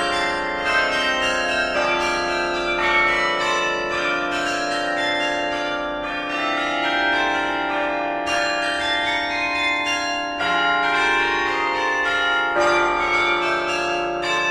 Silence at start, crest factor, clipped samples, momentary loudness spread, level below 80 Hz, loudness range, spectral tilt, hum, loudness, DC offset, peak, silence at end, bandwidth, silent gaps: 0 s; 14 dB; under 0.1%; 5 LU; -48 dBFS; 3 LU; -2.5 dB/octave; none; -20 LUFS; under 0.1%; -6 dBFS; 0 s; 13.5 kHz; none